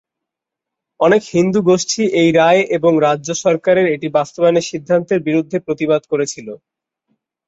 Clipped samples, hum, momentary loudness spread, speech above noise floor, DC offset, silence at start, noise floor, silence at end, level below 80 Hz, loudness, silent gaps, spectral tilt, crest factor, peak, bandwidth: under 0.1%; none; 7 LU; 68 dB; under 0.1%; 1 s; -83 dBFS; 0.9 s; -58 dBFS; -15 LUFS; none; -5 dB/octave; 14 dB; -2 dBFS; 8 kHz